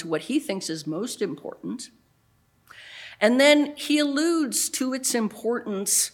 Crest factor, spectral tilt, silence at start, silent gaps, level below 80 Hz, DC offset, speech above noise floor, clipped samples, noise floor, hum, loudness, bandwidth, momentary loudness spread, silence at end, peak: 22 dB; -2.5 dB/octave; 0 s; none; -74 dBFS; under 0.1%; 40 dB; under 0.1%; -64 dBFS; none; -23 LUFS; 19 kHz; 17 LU; 0.05 s; -4 dBFS